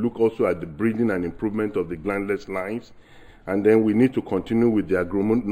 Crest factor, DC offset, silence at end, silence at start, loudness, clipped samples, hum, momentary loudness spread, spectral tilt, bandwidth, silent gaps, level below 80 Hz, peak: 18 dB; under 0.1%; 0 s; 0 s; -23 LUFS; under 0.1%; none; 10 LU; -8.5 dB/octave; 14 kHz; none; -50 dBFS; -4 dBFS